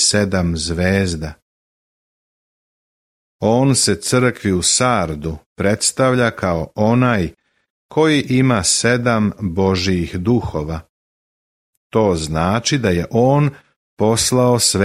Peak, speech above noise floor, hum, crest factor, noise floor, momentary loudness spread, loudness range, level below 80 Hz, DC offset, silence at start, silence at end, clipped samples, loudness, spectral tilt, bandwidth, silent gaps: -2 dBFS; over 74 dB; none; 16 dB; under -90 dBFS; 8 LU; 4 LU; -40 dBFS; under 0.1%; 0 s; 0 s; under 0.1%; -16 LUFS; -4.5 dB/octave; 15 kHz; 1.42-3.39 s, 5.46-5.56 s, 7.70-7.89 s, 10.89-11.90 s, 13.76-13.97 s